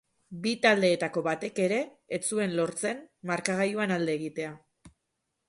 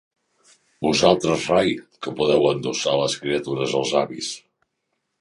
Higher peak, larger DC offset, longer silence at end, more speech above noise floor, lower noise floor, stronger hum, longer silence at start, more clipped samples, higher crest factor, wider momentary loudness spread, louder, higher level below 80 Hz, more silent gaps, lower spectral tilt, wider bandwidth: second, -8 dBFS vs -2 dBFS; neither; second, 0.6 s vs 0.85 s; about the same, 53 dB vs 55 dB; first, -81 dBFS vs -76 dBFS; neither; second, 0.3 s vs 0.8 s; neither; about the same, 22 dB vs 22 dB; about the same, 12 LU vs 12 LU; second, -29 LUFS vs -21 LUFS; second, -72 dBFS vs -56 dBFS; neither; about the same, -4 dB/octave vs -4 dB/octave; about the same, 11.5 kHz vs 11.5 kHz